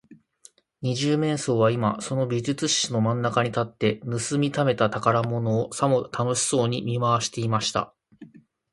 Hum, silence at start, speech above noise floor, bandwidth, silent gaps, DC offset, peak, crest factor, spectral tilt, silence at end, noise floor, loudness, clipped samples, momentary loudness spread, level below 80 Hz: none; 0.1 s; 32 dB; 11.5 kHz; none; under 0.1%; -4 dBFS; 20 dB; -5 dB/octave; 0.45 s; -56 dBFS; -24 LUFS; under 0.1%; 5 LU; -60 dBFS